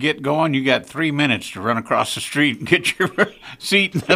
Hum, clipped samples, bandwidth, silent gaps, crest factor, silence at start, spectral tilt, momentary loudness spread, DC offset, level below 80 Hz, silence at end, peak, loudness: none; under 0.1%; 15.5 kHz; none; 20 dB; 0 s; -4.5 dB/octave; 5 LU; under 0.1%; -58 dBFS; 0 s; 0 dBFS; -19 LUFS